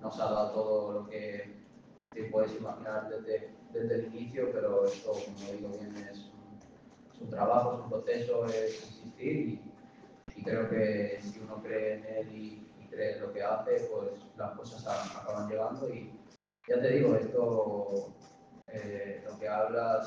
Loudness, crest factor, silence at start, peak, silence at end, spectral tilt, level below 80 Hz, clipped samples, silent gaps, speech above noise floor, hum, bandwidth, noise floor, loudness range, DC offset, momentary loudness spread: -34 LUFS; 22 dB; 0 s; -12 dBFS; 0 s; -7 dB/octave; -72 dBFS; under 0.1%; none; 26 dB; none; 7.6 kHz; -59 dBFS; 4 LU; under 0.1%; 17 LU